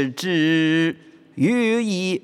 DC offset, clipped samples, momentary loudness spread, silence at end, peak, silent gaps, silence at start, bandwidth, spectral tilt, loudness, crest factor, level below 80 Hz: under 0.1%; under 0.1%; 9 LU; 0.05 s; -8 dBFS; none; 0 s; 13 kHz; -5.5 dB/octave; -20 LUFS; 12 dB; -72 dBFS